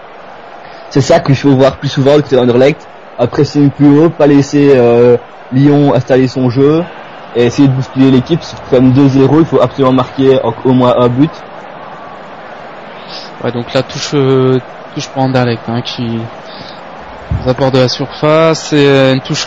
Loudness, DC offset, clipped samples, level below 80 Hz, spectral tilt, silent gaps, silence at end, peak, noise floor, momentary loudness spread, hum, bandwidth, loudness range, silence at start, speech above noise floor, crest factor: -10 LUFS; 0.9%; 1%; -38 dBFS; -7 dB/octave; none; 0 s; 0 dBFS; -31 dBFS; 21 LU; none; 7.8 kHz; 7 LU; 0 s; 22 dB; 10 dB